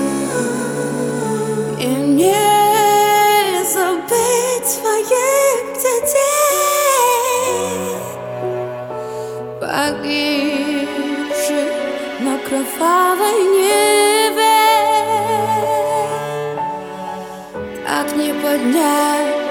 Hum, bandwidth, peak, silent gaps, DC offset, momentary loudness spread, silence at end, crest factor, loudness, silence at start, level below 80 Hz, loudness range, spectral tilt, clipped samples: none; 18 kHz; -2 dBFS; none; under 0.1%; 12 LU; 0 s; 14 dB; -16 LUFS; 0 s; -56 dBFS; 7 LU; -3 dB/octave; under 0.1%